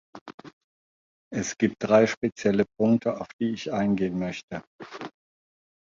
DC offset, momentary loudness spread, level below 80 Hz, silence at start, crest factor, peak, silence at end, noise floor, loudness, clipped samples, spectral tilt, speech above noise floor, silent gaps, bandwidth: under 0.1%; 21 LU; -60 dBFS; 0.15 s; 22 dB; -6 dBFS; 0.85 s; under -90 dBFS; -26 LUFS; under 0.1%; -6 dB/octave; over 65 dB; 0.21-0.26 s, 0.34-0.38 s, 0.53-1.31 s, 2.17-2.21 s, 3.33-3.39 s, 4.43-4.48 s, 4.67-4.79 s; 7.6 kHz